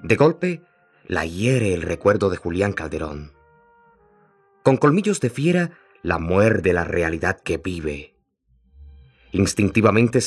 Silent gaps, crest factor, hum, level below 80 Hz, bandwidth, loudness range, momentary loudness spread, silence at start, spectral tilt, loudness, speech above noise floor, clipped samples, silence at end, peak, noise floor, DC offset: none; 20 dB; none; -48 dBFS; 13 kHz; 4 LU; 12 LU; 0 s; -6 dB/octave; -21 LUFS; 43 dB; under 0.1%; 0 s; -2 dBFS; -63 dBFS; under 0.1%